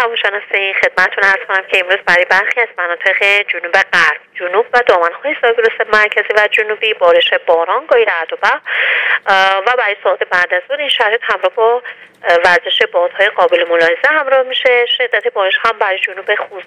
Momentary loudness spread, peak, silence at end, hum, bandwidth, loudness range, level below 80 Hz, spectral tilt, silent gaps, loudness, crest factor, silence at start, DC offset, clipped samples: 5 LU; 0 dBFS; 0.05 s; none; 12 kHz; 1 LU; -56 dBFS; -2 dB/octave; none; -12 LUFS; 12 dB; 0 s; under 0.1%; 0.1%